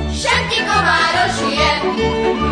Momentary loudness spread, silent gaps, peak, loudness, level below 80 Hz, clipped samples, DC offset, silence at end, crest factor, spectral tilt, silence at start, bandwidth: 4 LU; none; -2 dBFS; -15 LUFS; -30 dBFS; under 0.1%; under 0.1%; 0 s; 14 dB; -3.5 dB/octave; 0 s; 10.5 kHz